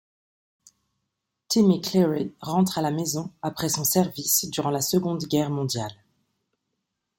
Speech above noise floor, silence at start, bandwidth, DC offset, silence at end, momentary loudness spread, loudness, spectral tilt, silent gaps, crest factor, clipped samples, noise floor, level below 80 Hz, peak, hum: 57 dB; 1.5 s; 17 kHz; under 0.1%; 1.25 s; 9 LU; -24 LUFS; -4.5 dB/octave; none; 20 dB; under 0.1%; -81 dBFS; -62 dBFS; -6 dBFS; none